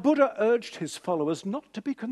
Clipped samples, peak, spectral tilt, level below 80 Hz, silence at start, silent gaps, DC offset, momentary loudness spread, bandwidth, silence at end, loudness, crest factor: under 0.1%; -8 dBFS; -5.5 dB/octave; -76 dBFS; 0 s; none; under 0.1%; 11 LU; 12.5 kHz; 0 s; -28 LUFS; 18 dB